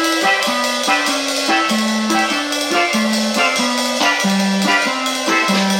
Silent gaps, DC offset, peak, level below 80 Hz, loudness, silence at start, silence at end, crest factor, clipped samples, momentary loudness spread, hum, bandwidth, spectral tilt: none; under 0.1%; -2 dBFS; -60 dBFS; -15 LUFS; 0 s; 0 s; 14 dB; under 0.1%; 3 LU; none; 16.5 kHz; -2.5 dB/octave